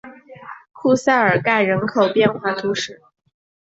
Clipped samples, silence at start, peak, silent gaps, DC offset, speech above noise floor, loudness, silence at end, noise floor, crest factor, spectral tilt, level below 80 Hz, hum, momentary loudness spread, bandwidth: under 0.1%; 0.05 s; -2 dBFS; none; under 0.1%; 21 dB; -18 LUFS; 0.75 s; -39 dBFS; 16 dB; -5 dB/octave; -60 dBFS; none; 17 LU; 8.2 kHz